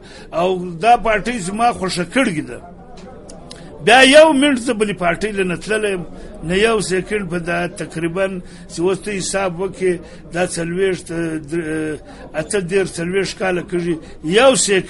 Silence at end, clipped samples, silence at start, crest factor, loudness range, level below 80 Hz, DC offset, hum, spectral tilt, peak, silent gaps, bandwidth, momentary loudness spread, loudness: 0 s; under 0.1%; 0 s; 18 dB; 7 LU; -40 dBFS; under 0.1%; none; -4 dB/octave; 0 dBFS; none; 11.5 kHz; 16 LU; -17 LUFS